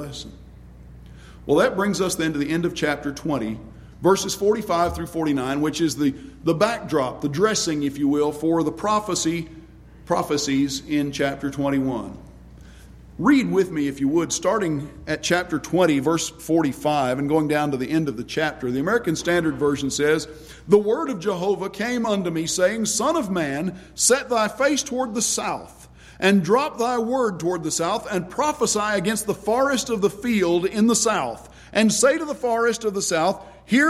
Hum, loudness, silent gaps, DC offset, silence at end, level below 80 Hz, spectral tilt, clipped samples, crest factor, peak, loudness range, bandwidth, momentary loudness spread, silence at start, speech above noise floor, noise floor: none; -22 LUFS; none; under 0.1%; 0 s; -48 dBFS; -4 dB/octave; under 0.1%; 20 dB; -2 dBFS; 3 LU; 15.5 kHz; 7 LU; 0 s; 23 dB; -44 dBFS